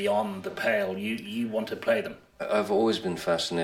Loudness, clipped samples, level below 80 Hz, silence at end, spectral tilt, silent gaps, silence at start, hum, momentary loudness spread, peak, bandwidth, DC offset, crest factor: -28 LUFS; under 0.1%; -66 dBFS; 0 s; -4.5 dB/octave; none; 0 s; none; 7 LU; -12 dBFS; 16.5 kHz; under 0.1%; 14 dB